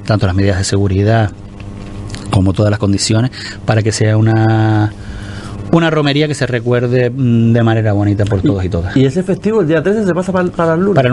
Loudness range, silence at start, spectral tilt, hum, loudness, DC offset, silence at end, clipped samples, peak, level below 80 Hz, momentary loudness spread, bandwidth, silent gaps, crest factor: 2 LU; 0 s; -6.5 dB/octave; none; -13 LUFS; under 0.1%; 0 s; under 0.1%; 0 dBFS; -36 dBFS; 15 LU; 11.5 kHz; none; 12 dB